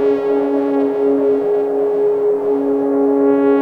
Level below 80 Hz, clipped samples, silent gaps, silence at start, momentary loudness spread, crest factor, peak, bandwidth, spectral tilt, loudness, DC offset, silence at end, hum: -64 dBFS; under 0.1%; none; 0 s; 3 LU; 12 dB; -4 dBFS; 4.4 kHz; -8 dB/octave; -16 LUFS; under 0.1%; 0 s; none